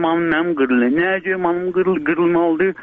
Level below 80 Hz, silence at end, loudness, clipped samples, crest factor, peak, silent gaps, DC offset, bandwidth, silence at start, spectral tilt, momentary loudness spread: -54 dBFS; 0 s; -17 LUFS; under 0.1%; 12 dB; -4 dBFS; none; under 0.1%; 3.8 kHz; 0 s; -4.5 dB/octave; 3 LU